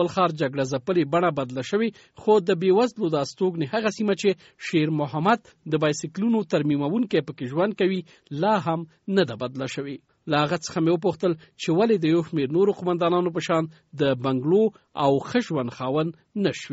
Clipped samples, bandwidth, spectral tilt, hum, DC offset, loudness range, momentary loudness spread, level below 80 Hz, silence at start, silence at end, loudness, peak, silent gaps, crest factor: under 0.1%; 8 kHz; -5.5 dB/octave; none; under 0.1%; 2 LU; 8 LU; -64 dBFS; 0 s; 0 s; -24 LUFS; -6 dBFS; none; 18 dB